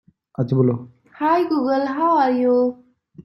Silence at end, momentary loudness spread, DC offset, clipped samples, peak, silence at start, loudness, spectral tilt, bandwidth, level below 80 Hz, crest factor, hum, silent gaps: 0.05 s; 9 LU; under 0.1%; under 0.1%; -6 dBFS; 0.4 s; -19 LUFS; -9.5 dB/octave; 6 kHz; -62 dBFS; 14 dB; none; none